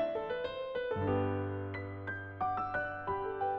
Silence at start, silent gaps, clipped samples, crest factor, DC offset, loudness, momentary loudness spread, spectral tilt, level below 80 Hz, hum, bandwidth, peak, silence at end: 0 s; none; under 0.1%; 14 dB; under 0.1%; -37 LUFS; 8 LU; -9 dB/octave; -60 dBFS; none; 5.8 kHz; -22 dBFS; 0 s